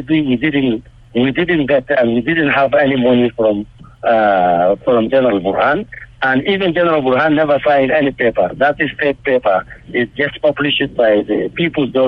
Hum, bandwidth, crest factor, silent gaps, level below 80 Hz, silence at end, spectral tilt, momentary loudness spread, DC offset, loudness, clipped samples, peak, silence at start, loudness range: none; 5.4 kHz; 10 dB; none; -44 dBFS; 0 s; -8.5 dB/octave; 7 LU; under 0.1%; -14 LUFS; under 0.1%; -4 dBFS; 0 s; 2 LU